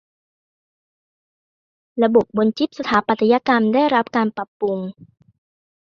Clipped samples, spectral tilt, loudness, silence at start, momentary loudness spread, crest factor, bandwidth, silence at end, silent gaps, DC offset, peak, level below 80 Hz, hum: under 0.1%; -7 dB/octave; -18 LUFS; 1.95 s; 9 LU; 20 dB; 7 kHz; 0.9 s; 4.48-4.60 s; under 0.1%; -2 dBFS; -60 dBFS; none